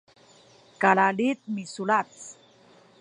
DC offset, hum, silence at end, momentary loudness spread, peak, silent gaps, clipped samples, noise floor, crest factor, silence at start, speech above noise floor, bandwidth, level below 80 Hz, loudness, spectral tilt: under 0.1%; none; 0.7 s; 20 LU; -6 dBFS; none; under 0.1%; -56 dBFS; 22 dB; 0.8 s; 32 dB; 10.5 kHz; -78 dBFS; -24 LUFS; -5 dB/octave